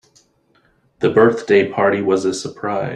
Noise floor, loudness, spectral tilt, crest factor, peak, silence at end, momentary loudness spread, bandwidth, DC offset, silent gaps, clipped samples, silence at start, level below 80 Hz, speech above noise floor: -59 dBFS; -16 LUFS; -5.5 dB/octave; 16 dB; -2 dBFS; 0 s; 9 LU; 10.5 kHz; under 0.1%; none; under 0.1%; 1 s; -58 dBFS; 43 dB